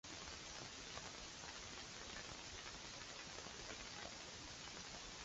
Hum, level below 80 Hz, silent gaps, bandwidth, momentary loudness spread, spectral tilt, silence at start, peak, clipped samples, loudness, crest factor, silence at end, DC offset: none; -66 dBFS; none; 8 kHz; 1 LU; -1.5 dB/octave; 0.05 s; -32 dBFS; under 0.1%; -51 LUFS; 20 dB; 0 s; under 0.1%